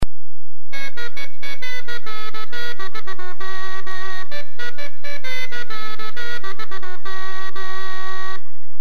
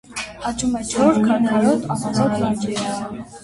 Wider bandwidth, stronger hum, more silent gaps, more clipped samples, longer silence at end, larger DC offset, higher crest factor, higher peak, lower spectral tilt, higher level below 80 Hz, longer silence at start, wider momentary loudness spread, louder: first, 13 kHz vs 11.5 kHz; neither; neither; neither; about the same, 0.05 s vs 0 s; first, 50% vs under 0.1%; first, 24 dB vs 16 dB; about the same, -4 dBFS vs -2 dBFS; second, -4 dB/octave vs -5.5 dB/octave; about the same, -44 dBFS vs -48 dBFS; about the same, 0 s vs 0.1 s; second, 4 LU vs 10 LU; second, -31 LUFS vs -20 LUFS